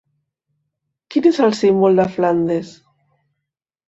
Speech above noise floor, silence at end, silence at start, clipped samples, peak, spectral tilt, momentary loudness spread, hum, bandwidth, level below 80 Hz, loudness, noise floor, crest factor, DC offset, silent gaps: 66 dB; 1.15 s; 1.1 s; under 0.1%; -2 dBFS; -7 dB/octave; 8 LU; none; 8 kHz; -60 dBFS; -16 LUFS; -81 dBFS; 16 dB; under 0.1%; none